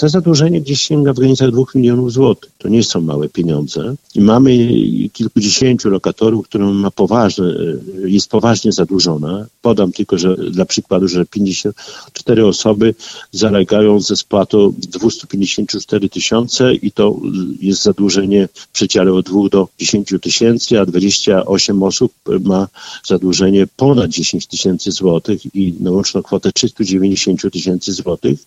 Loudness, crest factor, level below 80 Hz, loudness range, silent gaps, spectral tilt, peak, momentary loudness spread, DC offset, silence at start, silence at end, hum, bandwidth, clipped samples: -13 LUFS; 12 dB; -46 dBFS; 2 LU; none; -5 dB/octave; 0 dBFS; 7 LU; under 0.1%; 0 s; 0.1 s; none; 9.8 kHz; under 0.1%